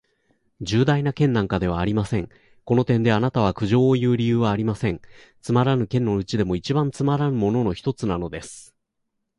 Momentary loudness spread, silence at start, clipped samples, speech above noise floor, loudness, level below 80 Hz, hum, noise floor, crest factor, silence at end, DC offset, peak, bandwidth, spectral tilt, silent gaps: 9 LU; 0.6 s; under 0.1%; 55 dB; -22 LUFS; -44 dBFS; none; -76 dBFS; 16 dB; 0.75 s; under 0.1%; -6 dBFS; 11.5 kHz; -7.5 dB/octave; none